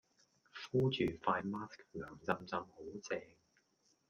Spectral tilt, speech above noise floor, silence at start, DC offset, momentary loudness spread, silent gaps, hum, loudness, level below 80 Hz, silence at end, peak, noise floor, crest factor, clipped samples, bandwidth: -6 dB/octave; 38 dB; 0.55 s; under 0.1%; 14 LU; none; none; -40 LUFS; -70 dBFS; 0.85 s; -18 dBFS; -77 dBFS; 22 dB; under 0.1%; 7.4 kHz